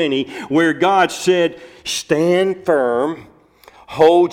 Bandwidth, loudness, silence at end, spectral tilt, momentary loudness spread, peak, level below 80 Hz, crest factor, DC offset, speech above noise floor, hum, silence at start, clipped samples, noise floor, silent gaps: 16 kHz; -16 LUFS; 0 s; -4.5 dB/octave; 10 LU; -2 dBFS; -58 dBFS; 14 dB; under 0.1%; 31 dB; none; 0 s; under 0.1%; -47 dBFS; none